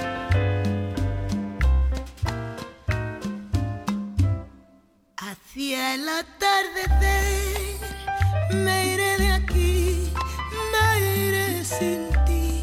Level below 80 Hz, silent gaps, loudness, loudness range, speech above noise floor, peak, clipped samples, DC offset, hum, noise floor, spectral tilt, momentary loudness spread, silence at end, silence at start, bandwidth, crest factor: -28 dBFS; none; -24 LUFS; 6 LU; 35 dB; -8 dBFS; under 0.1%; under 0.1%; none; -57 dBFS; -5 dB/octave; 10 LU; 0 s; 0 s; 16.5 kHz; 16 dB